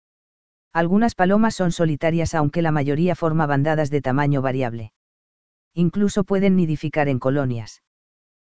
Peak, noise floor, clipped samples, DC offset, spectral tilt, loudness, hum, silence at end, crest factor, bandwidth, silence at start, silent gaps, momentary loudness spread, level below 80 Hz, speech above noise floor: -2 dBFS; under -90 dBFS; under 0.1%; 2%; -7.5 dB/octave; -21 LUFS; none; 0.55 s; 18 dB; 8 kHz; 0.7 s; 4.96-5.71 s; 8 LU; -46 dBFS; over 70 dB